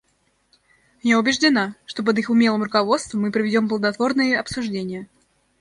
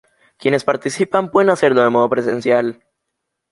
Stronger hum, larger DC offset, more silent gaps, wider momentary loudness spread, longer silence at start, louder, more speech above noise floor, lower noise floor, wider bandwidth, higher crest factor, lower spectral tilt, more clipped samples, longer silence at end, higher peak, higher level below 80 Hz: neither; neither; neither; first, 9 LU vs 6 LU; first, 1.05 s vs 0.45 s; second, -20 LUFS vs -16 LUFS; second, 46 dB vs 61 dB; second, -66 dBFS vs -77 dBFS; about the same, 11 kHz vs 11.5 kHz; about the same, 18 dB vs 16 dB; about the same, -4.5 dB/octave vs -5.5 dB/octave; neither; second, 0.55 s vs 0.8 s; about the same, -4 dBFS vs -2 dBFS; about the same, -58 dBFS vs -62 dBFS